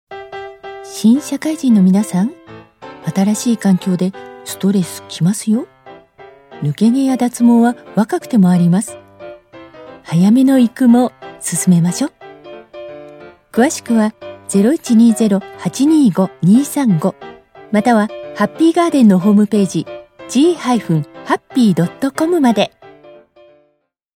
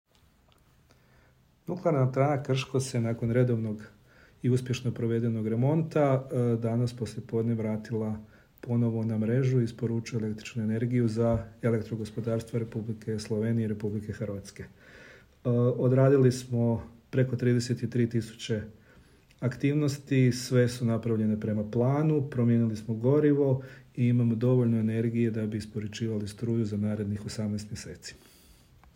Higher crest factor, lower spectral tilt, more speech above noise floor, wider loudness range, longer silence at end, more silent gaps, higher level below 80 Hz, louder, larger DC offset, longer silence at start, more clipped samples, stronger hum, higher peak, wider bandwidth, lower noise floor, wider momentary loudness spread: about the same, 14 dB vs 18 dB; second, -6 dB/octave vs -7.5 dB/octave; first, 50 dB vs 35 dB; about the same, 4 LU vs 5 LU; first, 1.5 s vs 0.8 s; neither; about the same, -60 dBFS vs -60 dBFS; first, -14 LUFS vs -28 LUFS; neither; second, 0.1 s vs 1.7 s; neither; neither; first, 0 dBFS vs -10 dBFS; about the same, 16 kHz vs 15.5 kHz; about the same, -63 dBFS vs -63 dBFS; first, 19 LU vs 10 LU